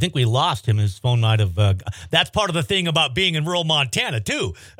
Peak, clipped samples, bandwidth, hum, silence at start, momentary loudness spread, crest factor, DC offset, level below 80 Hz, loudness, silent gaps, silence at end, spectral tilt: -2 dBFS; under 0.1%; 15.5 kHz; none; 0 s; 4 LU; 18 dB; under 0.1%; -50 dBFS; -20 LUFS; none; 0.1 s; -4.5 dB/octave